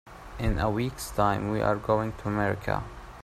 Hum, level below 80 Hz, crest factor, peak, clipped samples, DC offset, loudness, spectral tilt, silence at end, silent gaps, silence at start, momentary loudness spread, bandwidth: none; -40 dBFS; 20 dB; -10 dBFS; under 0.1%; under 0.1%; -28 LUFS; -6.5 dB/octave; 0 s; none; 0.05 s; 7 LU; 15 kHz